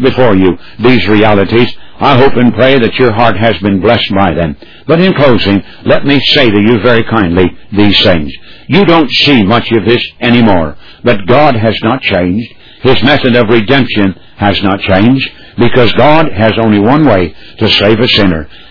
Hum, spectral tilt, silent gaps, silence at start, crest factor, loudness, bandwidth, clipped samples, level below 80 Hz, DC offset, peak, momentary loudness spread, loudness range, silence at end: none; -7.5 dB/octave; none; 0 s; 8 dB; -8 LUFS; 5.4 kHz; 2%; -32 dBFS; 10%; 0 dBFS; 7 LU; 2 LU; 0 s